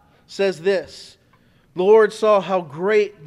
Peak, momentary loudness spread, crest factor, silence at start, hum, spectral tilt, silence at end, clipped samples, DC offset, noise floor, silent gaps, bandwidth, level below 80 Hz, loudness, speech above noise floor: -2 dBFS; 17 LU; 16 dB; 0.3 s; none; -5.5 dB/octave; 0 s; under 0.1%; under 0.1%; -56 dBFS; none; 11.5 kHz; -64 dBFS; -18 LUFS; 38 dB